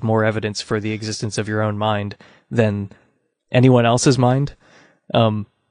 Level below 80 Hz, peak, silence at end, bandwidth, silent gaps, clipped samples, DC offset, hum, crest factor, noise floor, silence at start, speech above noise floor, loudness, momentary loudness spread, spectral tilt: -52 dBFS; -2 dBFS; 0.25 s; 10.5 kHz; none; under 0.1%; under 0.1%; none; 18 dB; -63 dBFS; 0 s; 45 dB; -19 LUFS; 12 LU; -6 dB/octave